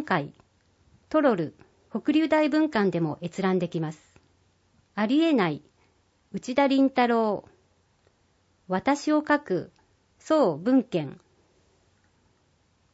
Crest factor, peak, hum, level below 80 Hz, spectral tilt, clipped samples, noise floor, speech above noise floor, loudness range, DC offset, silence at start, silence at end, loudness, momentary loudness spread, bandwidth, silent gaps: 18 dB; -8 dBFS; none; -68 dBFS; -6.5 dB/octave; under 0.1%; -67 dBFS; 42 dB; 3 LU; under 0.1%; 0 s; 1.8 s; -25 LUFS; 14 LU; 8 kHz; none